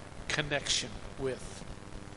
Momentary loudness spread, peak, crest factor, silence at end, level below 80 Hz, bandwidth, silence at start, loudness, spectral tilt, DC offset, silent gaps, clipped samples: 16 LU; -12 dBFS; 24 dB; 0 s; -50 dBFS; 11.5 kHz; 0 s; -34 LUFS; -2.5 dB/octave; 0.1%; none; under 0.1%